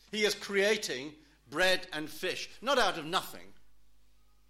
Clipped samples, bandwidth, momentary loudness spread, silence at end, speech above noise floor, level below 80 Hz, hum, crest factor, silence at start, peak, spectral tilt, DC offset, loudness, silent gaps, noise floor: under 0.1%; 16.5 kHz; 12 LU; 0.55 s; 35 dB; -62 dBFS; none; 18 dB; 0.1 s; -16 dBFS; -2.5 dB/octave; under 0.1%; -31 LUFS; none; -67 dBFS